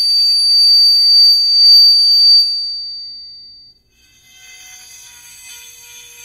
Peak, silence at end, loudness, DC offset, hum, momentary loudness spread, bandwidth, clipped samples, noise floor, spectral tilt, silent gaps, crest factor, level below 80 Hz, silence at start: -2 dBFS; 0.7 s; -6 LUFS; under 0.1%; 60 Hz at -65 dBFS; 18 LU; 16 kHz; under 0.1%; -52 dBFS; 4 dB/octave; none; 12 dB; -62 dBFS; 0 s